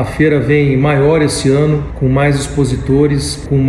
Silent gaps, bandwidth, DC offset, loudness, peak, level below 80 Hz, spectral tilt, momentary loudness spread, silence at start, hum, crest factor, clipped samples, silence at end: none; 12.5 kHz; under 0.1%; -12 LUFS; 0 dBFS; -28 dBFS; -6.5 dB/octave; 5 LU; 0 s; none; 12 dB; under 0.1%; 0 s